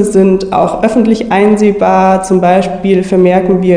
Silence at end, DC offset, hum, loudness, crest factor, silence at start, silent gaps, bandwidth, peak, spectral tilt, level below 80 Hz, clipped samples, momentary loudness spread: 0 s; 0.4%; none; -9 LUFS; 8 dB; 0 s; none; 10 kHz; 0 dBFS; -7 dB/octave; -36 dBFS; 1%; 3 LU